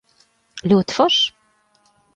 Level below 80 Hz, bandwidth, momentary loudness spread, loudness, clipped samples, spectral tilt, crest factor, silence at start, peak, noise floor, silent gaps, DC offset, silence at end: -58 dBFS; 9 kHz; 13 LU; -17 LUFS; under 0.1%; -5 dB/octave; 18 dB; 0.55 s; -4 dBFS; -61 dBFS; none; under 0.1%; 0.85 s